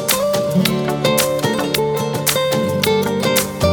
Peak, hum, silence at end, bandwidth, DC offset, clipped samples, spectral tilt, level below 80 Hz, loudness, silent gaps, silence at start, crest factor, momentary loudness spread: 0 dBFS; none; 0 s; over 20 kHz; under 0.1%; under 0.1%; -4 dB/octave; -42 dBFS; -17 LUFS; none; 0 s; 16 dB; 2 LU